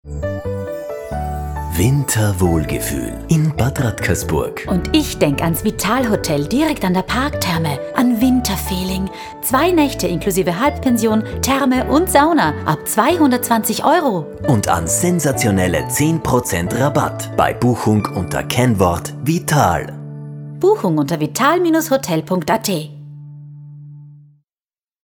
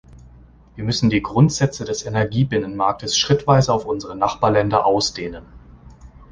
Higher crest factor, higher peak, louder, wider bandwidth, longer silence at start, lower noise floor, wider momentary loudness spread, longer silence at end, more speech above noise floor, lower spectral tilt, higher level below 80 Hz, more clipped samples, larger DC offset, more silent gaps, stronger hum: about the same, 16 dB vs 18 dB; about the same, 0 dBFS vs -2 dBFS; about the same, -17 LUFS vs -19 LUFS; first, over 20 kHz vs 9.8 kHz; about the same, 0.05 s vs 0.15 s; first, under -90 dBFS vs -46 dBFS; about the same, 10 LU vs 10 LU; first, 0.9 s vs 0.1 s; first, over 74 dB vs 28 dB; about the same, -5 dB/octave vs -5 dB/octave; first, -34 dBFS vs -44 dBFS; neither; neither; neither; neither